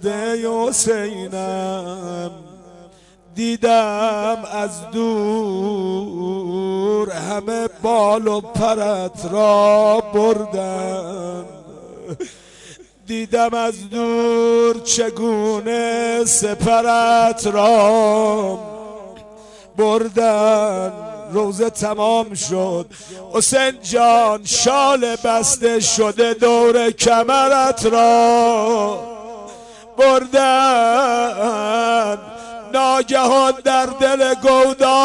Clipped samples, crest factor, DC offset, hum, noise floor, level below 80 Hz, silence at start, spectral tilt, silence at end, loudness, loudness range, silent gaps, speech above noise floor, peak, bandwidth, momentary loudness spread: under 0.1%; 14 dB; under 0.1%; none; -47 dBFS; -52 dBFS; 0 s; -3 dB/octave; 0 s; -16 LUFS; 7 LU; none; 31 dB; -2 dBFS; 11.5 kHz; 15 LU